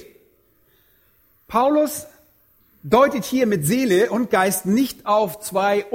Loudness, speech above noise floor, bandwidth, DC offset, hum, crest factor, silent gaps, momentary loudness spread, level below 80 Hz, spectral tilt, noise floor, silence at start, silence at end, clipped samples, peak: -19 LUFS; 41 dB; 17 kHz; under 0.1%; none; 20 dB; none; 7 LU; -56 dBFS; -5 dB/octave; -60 dBFS; 1.5 s; 0 s; under 0.1%; -2 dBFS